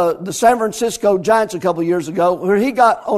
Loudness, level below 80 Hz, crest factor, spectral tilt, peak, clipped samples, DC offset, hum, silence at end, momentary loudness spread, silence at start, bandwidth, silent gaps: -16 LUFS; -54 dBFS; 16 dB; -5 dB/octave; 0 dBFS; under 0.1%; under 0.1%; none; 0 s; 5 LU; 0 s; 14 kHz; none